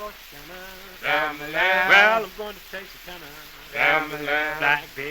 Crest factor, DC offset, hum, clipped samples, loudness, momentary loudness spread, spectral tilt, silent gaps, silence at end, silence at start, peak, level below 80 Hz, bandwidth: 20 dB; under 0.1%; none; under 0.1%; -20 LUFS; 24 LU; -2.5 dB/octave; none; 0 s; 0 s; -4 dBFS; -52 dBFS; over 20 kHz